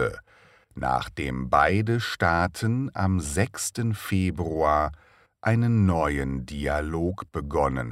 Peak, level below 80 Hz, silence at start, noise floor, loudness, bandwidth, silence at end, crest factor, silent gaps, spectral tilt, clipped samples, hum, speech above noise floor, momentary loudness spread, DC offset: -6 dBFS; -40 dBFS; 0 s; -57 dBFS; -26 LUFS; 16 kHz; 0 s; 18 dB; none; -6 dB/octave; under 0.1%; none; 32 dB; 9 LU; under 0.1%